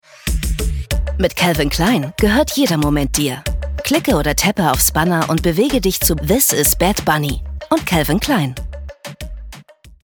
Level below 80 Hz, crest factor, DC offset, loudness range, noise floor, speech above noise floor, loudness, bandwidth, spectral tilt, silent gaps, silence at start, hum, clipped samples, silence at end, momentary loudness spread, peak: -26 dBFS; 16 dB; under 0.1%; 2 LU; -41 dBFS; 26 dB; -16 LUFS; over 20 kHz; -4 dB/octave; none; 0.25 s; none; under 0.1%; 0.15 s; 12 LU; -2 dBFS